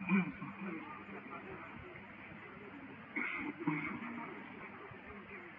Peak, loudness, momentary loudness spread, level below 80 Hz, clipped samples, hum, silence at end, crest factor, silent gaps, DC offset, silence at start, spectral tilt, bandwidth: -22 dBFS; -44 LUFS; 12 LU; -72 dBFS; under 0.1%; none; 0 s; 22 dB; none; under 0.1%; 0 s; -5.5 dB/octave; 4.9 kHz